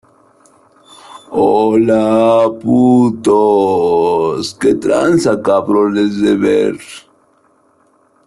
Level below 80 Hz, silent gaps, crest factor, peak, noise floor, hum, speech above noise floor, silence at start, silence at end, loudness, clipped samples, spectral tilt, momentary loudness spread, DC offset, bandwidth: -52 dBFS; none; 12 dB; -2 dBFS; -54 dBFS; none; 42 dB; 1.1 s; 1.3 s; -12 LUFS; under 0.1%; -6.5 dB/octave; 5 LU; under 0.1%; 12 kHz